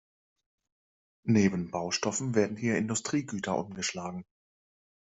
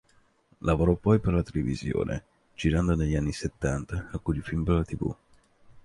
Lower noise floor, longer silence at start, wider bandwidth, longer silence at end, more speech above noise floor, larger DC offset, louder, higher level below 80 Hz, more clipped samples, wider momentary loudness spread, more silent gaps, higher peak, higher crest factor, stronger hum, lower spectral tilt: first, under -90 dBFS vs -63 dBFS; first, 1.25 s vs 0.65 s; second, 8.2 kHz vs 11.5 kHz; first, 0.85 s vs 0.05 s; first, over 60 dB vs 36 dB; neither; about the same, -30 LUFS vs -28 LUFS; second, -68 dBFS vs -38 dBFS; neither; first, 12 LU vs 9 LU; neither; about the same, -12 dBFS vs -10 dBFS; about the same, 20 dB vs 18 dB; neither; second, -4.5 dB/octave vs -7.5 dB/octave